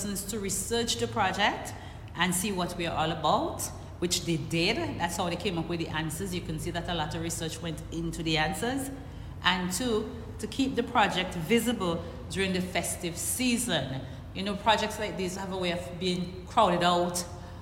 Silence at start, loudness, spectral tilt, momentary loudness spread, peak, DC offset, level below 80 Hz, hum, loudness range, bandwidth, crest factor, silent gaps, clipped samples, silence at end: 0 s; -29 LUFS; -4 dB/octave; 10 LU; -10 dBFS; under 0.1%; -48 dBFS; none; 3 LU; 16.5 kHz; 20 dB; none; under 0.1%; 0 s